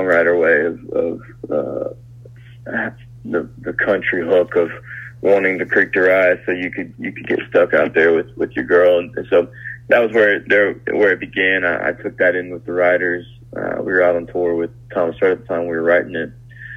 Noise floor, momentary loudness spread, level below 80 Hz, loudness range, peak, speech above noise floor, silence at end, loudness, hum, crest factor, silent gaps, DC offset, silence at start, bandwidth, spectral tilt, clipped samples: -39 dBFS; 13 LU; -52 dBFS; 5 LU; 0 dBFS; 22 dB; 0 s; -17 LUFS; none; 16 dB; none; under 0.1%; 0 s; 6.4 kHz; -7 dB/octave; under 0.1%